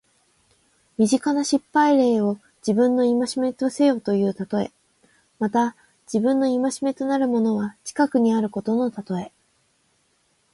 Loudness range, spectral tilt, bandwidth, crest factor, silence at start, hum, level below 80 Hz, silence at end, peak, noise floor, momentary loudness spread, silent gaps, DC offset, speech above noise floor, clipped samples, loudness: 4 LU; -5.5 dB/octave; 11.5 kHz; 16 dB; 1 s; none; -66 dBFS; 1.25 s; -6 dBFS; -66 dBFS; 10 LU; none; under 0.1%; 45 dB; under 0.1%; -22 LUFS